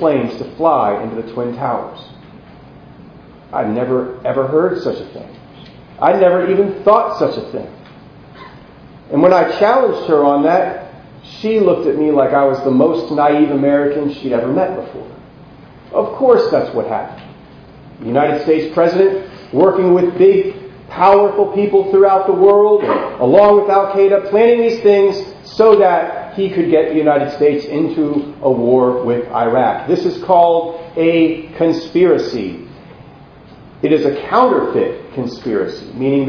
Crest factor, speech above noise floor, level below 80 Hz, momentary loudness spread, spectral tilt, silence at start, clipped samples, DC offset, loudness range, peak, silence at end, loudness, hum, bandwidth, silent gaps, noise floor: 14 dB; 26 dB; -50 dBFS; 12 LU; -8 dB/octave; 0 s; under 0.1%; under 0.1%; 7 LU; 0 dBFS; 0 s; -14 LUFS; none; 5.4 kHz; none; -39 dBFS